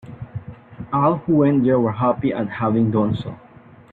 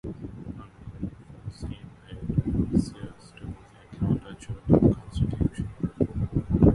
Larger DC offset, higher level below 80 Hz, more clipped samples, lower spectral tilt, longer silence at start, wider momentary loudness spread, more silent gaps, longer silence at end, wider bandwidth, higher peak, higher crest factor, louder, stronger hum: neither; second, -52 dBFS vs -38 dBFS; neither; first, -11 dB/octave vs -9.5 dB/octave; about the same, 0.05 s vs 0.05 s; second, 18 LU vs 21 LU; neither; first, 0.55 s vs 0 s; second, 4.4 kHz vs 11.5 kHz; about the same, -6 dBFS vs -4 dBFS; second, 16 dB vs 24 dB; first, -19 LUFS vs -27 LUFS; neither